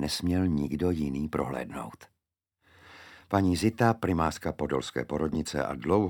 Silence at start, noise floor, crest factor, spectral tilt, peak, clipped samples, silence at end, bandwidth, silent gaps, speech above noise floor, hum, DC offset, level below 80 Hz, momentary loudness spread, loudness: 0 s; -85 dBFS; 20 dB; -6 dB/octave; -8 dBFS; under 0.1%; 0 s; 19 kHz; none; 57 dB; none; under 0.1%; -48 dBFS; 11 LU; -29 LUFS